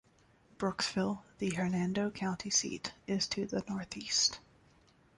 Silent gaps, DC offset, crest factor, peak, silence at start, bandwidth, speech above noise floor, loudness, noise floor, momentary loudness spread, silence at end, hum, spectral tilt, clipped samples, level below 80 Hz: none; under 0.1%; 20 dB; -16 dBFS; 0.6 s; 11.5 kHz; 32 dB; -34 LUFS; -66 dBFS; 10 LU; 0.75 s; none; -3 dB/octave; under 0.1%; -66 dBFS